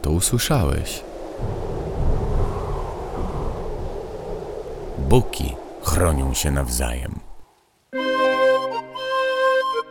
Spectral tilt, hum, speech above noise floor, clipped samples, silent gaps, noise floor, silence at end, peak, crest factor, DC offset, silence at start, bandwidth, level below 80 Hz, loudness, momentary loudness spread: -4.5 dB/octave; none; 35 dB; under 0.1%; none; -55 dBFS; 0 s; 0 dBFS; 22 dB; under 0.1%; 0 s; over 20 kHz; -28 dBFS; -23 LUFS; 13 LU